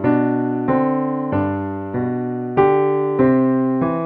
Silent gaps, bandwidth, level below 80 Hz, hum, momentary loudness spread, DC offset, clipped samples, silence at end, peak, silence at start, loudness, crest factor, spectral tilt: none; 3.8 kHz; -50 dBFS; none; 8 LU; under 0.1%; under 0.1%; 0 s; -4 dBFS; 0 s; -18 LUFS; 14 dB; -11.5 dB/octave